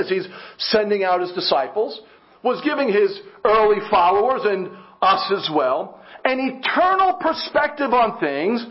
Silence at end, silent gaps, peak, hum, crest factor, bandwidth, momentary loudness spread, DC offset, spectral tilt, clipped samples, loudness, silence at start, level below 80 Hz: 0 s; none; -2 dBFS; none; 18 dB; 5.8 kHz; 9 LU; under 0.1%; -8 dB/octave; under 0.1%; -19 LUFS; 0 s; -58 dBFS